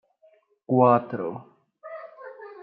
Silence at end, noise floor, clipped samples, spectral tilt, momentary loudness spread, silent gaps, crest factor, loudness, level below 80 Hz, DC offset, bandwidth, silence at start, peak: 0 s; -61 dBFS; under 0.1%; -12.5 dB/octave; 23 LU; none; 20 dB; -23 LUFS; -80 dBFS; under 0.1%; 4.8 kHz; 0.7 s; -6 dBFS